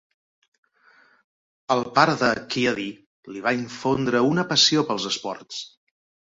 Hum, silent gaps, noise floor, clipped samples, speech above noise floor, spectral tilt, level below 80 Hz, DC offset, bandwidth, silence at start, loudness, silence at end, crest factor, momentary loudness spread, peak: none; 3.06-3.23 s; -58 dBFS; under 0.1%; 35 dB; -3.5 dB/octave; -62 dBFS; under 0.1%; 8 kHz; 1.7 s; -22 LUFS; 0.65 s; 22 dB; 17 LU; -2 dBFS